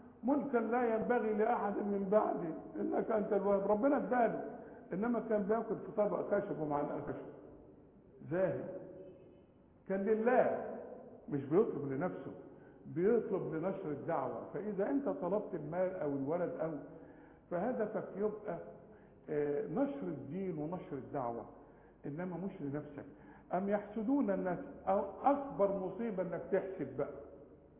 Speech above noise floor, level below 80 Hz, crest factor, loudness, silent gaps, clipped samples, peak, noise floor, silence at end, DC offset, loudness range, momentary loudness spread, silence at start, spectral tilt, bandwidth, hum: 27 dB; -70 dBFS; 22 dB; -37 LUFS; none; under 0.1%; -14 dBFS; -63 dBFS; 0.25 s; under 0.1%; 6 LU; 17 LU; 0 s; -8.5 dB/octave; 3.6 kHz; none